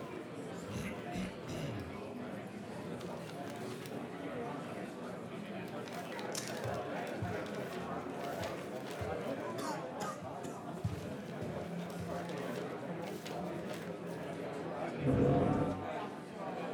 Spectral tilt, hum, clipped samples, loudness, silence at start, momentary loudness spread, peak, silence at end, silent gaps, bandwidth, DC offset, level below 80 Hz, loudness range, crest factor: -6 dB/octave; none; under 0.1%; -40 LUFS; 0 s; 7 LU; -18 dBFS; 0 s; none; over 20 kHz; under 0.1%; -62 dBFS; 7 LU; 22 dB